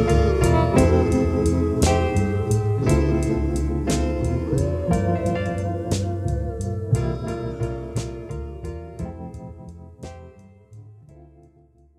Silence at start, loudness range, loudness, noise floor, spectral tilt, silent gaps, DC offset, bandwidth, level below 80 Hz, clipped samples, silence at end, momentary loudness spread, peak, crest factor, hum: 0 s; 16 LU; -22 LUFS; -55 dBFS; -7 dB/octave; none; under 0.1%; 13.5 kHz; -30 dBFS; under 0.1%; 0.75 s; 18 LU; -4 dBFS; 18 dB; none